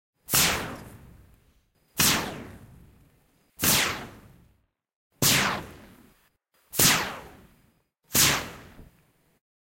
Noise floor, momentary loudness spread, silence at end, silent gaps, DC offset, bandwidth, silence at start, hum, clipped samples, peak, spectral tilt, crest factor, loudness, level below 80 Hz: -67 dBFS; 22 LU; 0.95 s; 4.96-5.10 s; under 0.1%; 16.5 kHz; 0.3 s; none; under 0.1%; -4 dBFS; -1.5 dB/octave; 24 dB; -23 LUFS; -52 dBFS